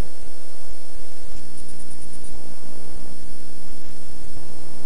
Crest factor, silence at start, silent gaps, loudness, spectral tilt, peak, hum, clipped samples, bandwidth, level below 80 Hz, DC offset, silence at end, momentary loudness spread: 12 dB; 0 s; none; -42 LUFS; -5 dB/octave; -8 dBFS; 60 Hz at -55 dBFS; under 0.1%; 11.5 kHz; -44 dBFS; 30%; 0 s; 2 LU